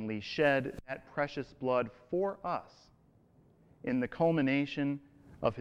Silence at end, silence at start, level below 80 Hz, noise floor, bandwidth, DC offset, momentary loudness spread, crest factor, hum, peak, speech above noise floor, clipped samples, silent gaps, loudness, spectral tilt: 0 s; 0 s; -64 dBFS; -65 dBFS; 7.8 kHz; under 0.1%; 11 LU; 18 dB; none; -16 dBFS; 32 dB; under 0.1%; none; -34 LUFS; -7.5 dB/octave